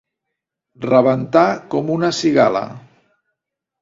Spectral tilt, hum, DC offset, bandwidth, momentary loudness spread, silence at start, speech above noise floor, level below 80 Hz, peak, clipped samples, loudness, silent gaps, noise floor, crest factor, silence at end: -6 dB/octave; none; under 0.1%; 7.8 kHz; 10 LU; 0.8 s; 65 dB; -60 dBFS; 0 dBFS; under 0.1%; -16 LUFS; none; -80 dBFS; 18 dB; 1 s